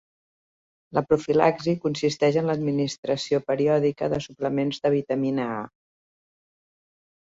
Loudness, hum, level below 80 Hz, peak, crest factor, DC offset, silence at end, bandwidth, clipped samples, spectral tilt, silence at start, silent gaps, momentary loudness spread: -24 LUFS; none; -60 dBFS; -4 dBFS; 22 dB; under 0.1%; 1.6 s; 7.8 kHz; under 0.1%; -6 dB/octave; 0.9 s; 2.98-3.03 s; 7 LU